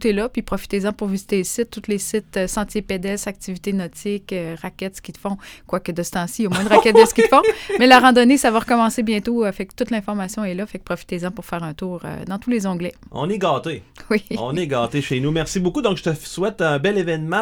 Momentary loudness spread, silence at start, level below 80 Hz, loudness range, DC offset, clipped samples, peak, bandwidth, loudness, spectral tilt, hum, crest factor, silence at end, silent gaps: 16 LU; 0 s; -44 dBFS; 12 LU; under 0.1%; under 0.1%; 0 dBFS; over 20 kHz; -19 LUFS; -5 dB/octave; none; 20 dB; 0 s; none